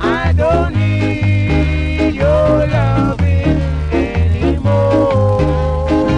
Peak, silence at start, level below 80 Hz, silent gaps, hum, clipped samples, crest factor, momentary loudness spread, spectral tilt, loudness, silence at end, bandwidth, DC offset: -2 dBFS; 0 s; -20 dBFS; none; none; under 0.1%; 10 dB; 4 LU; -8.5 dB/octave; -14 LUFS; 0 s; 9.6 kHz; under 0.1%